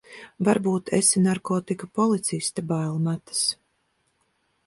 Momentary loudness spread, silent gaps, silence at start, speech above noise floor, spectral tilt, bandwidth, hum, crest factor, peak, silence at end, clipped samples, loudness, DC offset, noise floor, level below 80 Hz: 8 LU; none; 0.1 s; 47 dB; -4.5 dB/octave; 11.5 kHz; none; 20 dB; -6 dBFS; 1.1 s; under 0.1%; -24 LUFS; under 0.1%; -71 dBFS; -64 dBFS